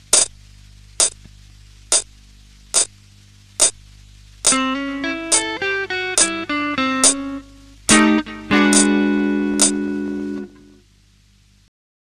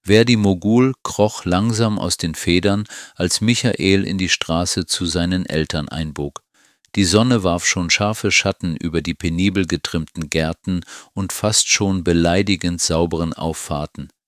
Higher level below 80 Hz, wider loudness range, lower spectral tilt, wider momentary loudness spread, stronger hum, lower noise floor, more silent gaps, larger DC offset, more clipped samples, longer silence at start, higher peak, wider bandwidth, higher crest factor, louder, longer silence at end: second, -48 dBFS vs -36 dBFS; first, 5 LU vs 2 LU; second, -2 dB/octave vs -4 dB/octave; about the same, 12 LU vs 10 LU; first, 50 Hz at -50 dBFS vs none; second, -53 dBFS vs -58 dBFS; neither; neither; neither; about the same, 0.1 s vs 0.05 s; about the same, 0 dBFS vs 0 dBFS; second, 14 kHz vs 16 kHz; about the same, 20 dB vs 18 dB; about the same, -17 LUFS vs -18 LUFS; first, 1.55 s vs 0.2 s